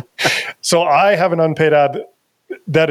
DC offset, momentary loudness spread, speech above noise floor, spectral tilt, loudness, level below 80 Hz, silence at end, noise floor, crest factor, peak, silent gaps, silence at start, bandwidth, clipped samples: under 0.1%; 14 LU; 21 dB; -4 dB/octave; -15 LUFS; -58 dBFS; 0 s; -34 dBFS; 14 dB; -2 dBFS; none; 0.2 s; 15 kHz; under 0.1%